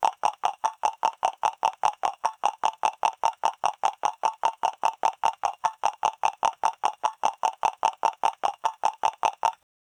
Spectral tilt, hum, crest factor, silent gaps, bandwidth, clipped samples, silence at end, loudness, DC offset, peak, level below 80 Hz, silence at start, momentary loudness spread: -0.5 dB/octave; none; 20 dB; none; 18 kHz; under 0.1%; 0.5 s; -27 LUFS; under 0.1%; -6 dBFS; -68 dBFS; 0 s; 2 LU